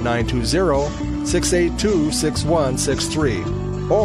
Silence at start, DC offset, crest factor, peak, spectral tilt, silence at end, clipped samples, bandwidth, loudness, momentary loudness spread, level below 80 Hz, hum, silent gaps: 0 s; under 0.1%; 14 dB; -6 dBFS; -5 dB/octave; 0 s; under 0.1%; 15 kHz; -19 LUFS; 6 LU; -30 dBFS; none; none